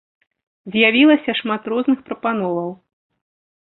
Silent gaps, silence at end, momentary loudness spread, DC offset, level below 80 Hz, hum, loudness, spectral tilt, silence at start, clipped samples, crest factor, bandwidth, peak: none; 0.95 s; 12 LU; under 0.1%; -64 dBFS; none; -17 LUFS; -9.5 dB/octave; 0.65 s; under 0.1%; 18 dB; 4.2 kHz; -2 dBFS